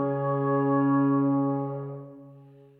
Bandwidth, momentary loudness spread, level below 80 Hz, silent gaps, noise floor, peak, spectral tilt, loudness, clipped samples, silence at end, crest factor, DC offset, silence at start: 3 kHz; 16 LU; -78 dBFS; none; -51 dBFS; -14 dBFS; -13 dB/octave; -25 LUFS; under 0.1%; 0.35 s; 12 dB; under 0.1%; 0 s